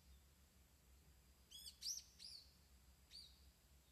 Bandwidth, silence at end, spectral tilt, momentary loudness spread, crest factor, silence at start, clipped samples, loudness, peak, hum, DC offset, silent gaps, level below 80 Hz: 14 kHz; 0 s; 0 dB/octave; 14 LU; 24 dB; 0 s; under 0.1%; -54 LUFS; -36 dBFS; none; under 0.1%; none; -72 dBFS